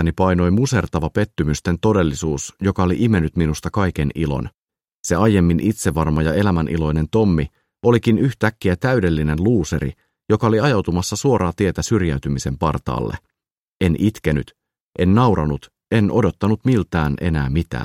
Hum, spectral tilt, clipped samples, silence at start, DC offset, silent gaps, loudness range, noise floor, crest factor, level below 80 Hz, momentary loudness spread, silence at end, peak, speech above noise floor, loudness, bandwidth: none; -6.5 dB/octave; under 0.1%; 0 s; under 0.1%; 4.58-4.67 s, 4.95-5.04 s, 13.51-13.80 s, 14.80-14.93 s; 3 LU; -81 dBFS; 16 dB; -34 dBFS; 7 LU; 0 s; -2 dBFS; 63 dB; -19 LUFS; 15 kHz